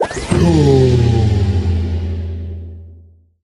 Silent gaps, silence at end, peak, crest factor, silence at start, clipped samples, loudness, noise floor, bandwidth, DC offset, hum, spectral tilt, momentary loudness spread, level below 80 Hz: none; 0.45 s; 0 dBFS; 14 dB; 0 s; under 0.1%; -14 LUFS; -44 dBFS; 11.5 kHz; under 0.1%; none; -7.5 dB/octave; 17 LU; -26 dBFS